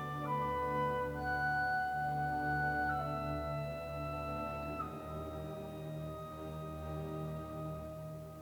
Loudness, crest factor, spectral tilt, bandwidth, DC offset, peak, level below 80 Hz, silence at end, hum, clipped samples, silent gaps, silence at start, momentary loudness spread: -39 LUFS; 14 dB; -7 dB/octave; over 20 kHz; under 0.1%; -24 dBFS; -56 dBFS; 0 s; none; under 0.1%; none; 0 s; 10 LU